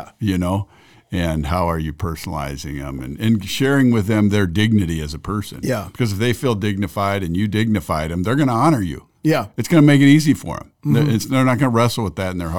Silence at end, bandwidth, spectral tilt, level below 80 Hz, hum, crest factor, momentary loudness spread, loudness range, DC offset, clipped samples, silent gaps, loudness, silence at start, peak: 0 s; 19 kHz; -6.5 dB/octave; -40 dBFS; none; 16 dB; 11 LU; 5 LU; 0.5%; under 0.1%; none; -18 LUFS; 0 s; -2 dBFS